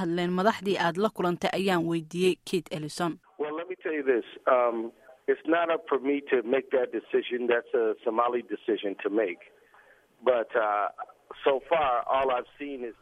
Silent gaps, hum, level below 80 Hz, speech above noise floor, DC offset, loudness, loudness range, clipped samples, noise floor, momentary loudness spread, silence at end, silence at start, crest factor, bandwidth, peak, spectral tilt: none; none; -66 dBFS; 31 dB; under 0.1%; -28 LUFS; 2 LU; under 0.1%; -59 dBFS; 9 LU; 0.1 s; 0 s; 20 dB; 13.5 kHz; -8 dBFS; -5.5 dB/octave